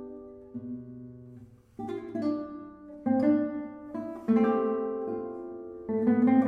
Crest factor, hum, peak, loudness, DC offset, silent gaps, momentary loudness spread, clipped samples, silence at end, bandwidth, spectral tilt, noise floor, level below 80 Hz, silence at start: 18 dB; none; -12 dBFS; -30 LUFS; under 0.1%; none; 21 LU; under 0.1%; 0 s; 5.2 kHz; -9.5 dB/octave; -51 dBFS; -66 dBFS; 0 s